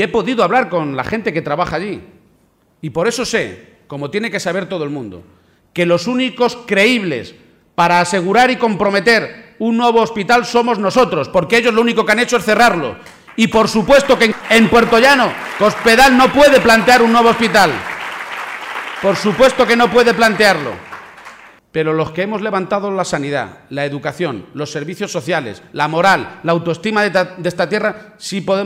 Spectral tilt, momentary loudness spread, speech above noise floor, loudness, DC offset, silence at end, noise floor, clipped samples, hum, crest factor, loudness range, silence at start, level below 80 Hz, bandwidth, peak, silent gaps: -4.5 dB/octave; 15 LU; 41 dB; -14 LUFS; under 0.1%; 0 s; -55 dBFS; under 0.1%; none; 12 dB; 10 LU; 0 s; -44 dBFS; 16 kHz; -2 dBFS; none